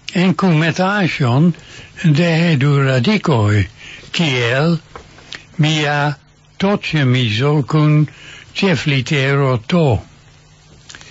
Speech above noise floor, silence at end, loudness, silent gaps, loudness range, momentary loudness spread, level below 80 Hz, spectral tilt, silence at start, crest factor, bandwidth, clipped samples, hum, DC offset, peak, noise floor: 31 dB; 0.2 s; -15 LUFS; none; 3 LU; 10 LU; -46 dBFS; -6.5 dB/octave; 0.1 s; 14 dB; 8 kHz; under 0.1%; none; under 0.1%; -2 dBFS; -45 dBFS